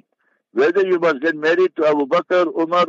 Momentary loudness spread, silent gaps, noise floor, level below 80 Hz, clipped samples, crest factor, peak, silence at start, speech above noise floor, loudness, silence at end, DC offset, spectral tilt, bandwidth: 2 LU; none; -67 dBFS; -74 dBFS; under 0.1%; 12 dB; -4 dBFS; 0.55 s; 50 dB; -18 LUFS; 0 s; under 0.1%; -5.5 dB/octave; 7.6 kHz